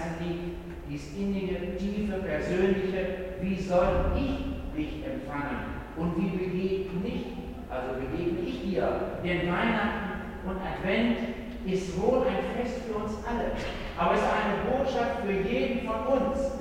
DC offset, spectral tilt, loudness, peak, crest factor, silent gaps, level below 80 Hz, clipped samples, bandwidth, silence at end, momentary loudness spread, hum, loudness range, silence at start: under 0.1%; -7 dB/octave; -30 LUFS; -12 dBFS; 18 dB; none; -40 dBFS; under 0.1%; 16 kHz; 0 s; 9 LU; none; 3 LU; 0 s